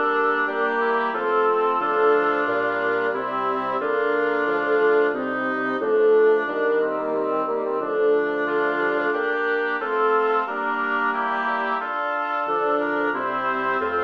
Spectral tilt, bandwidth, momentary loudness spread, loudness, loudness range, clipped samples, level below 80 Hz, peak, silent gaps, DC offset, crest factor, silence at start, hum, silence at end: -6 dB/octave; 5.6 kHz; 5 LU; -22 LUFS; 2 LU; under 0.1%; -70 dBFS; -8 dBFS; none; under 0.1%; 14 dB; 0 s; none; 0 s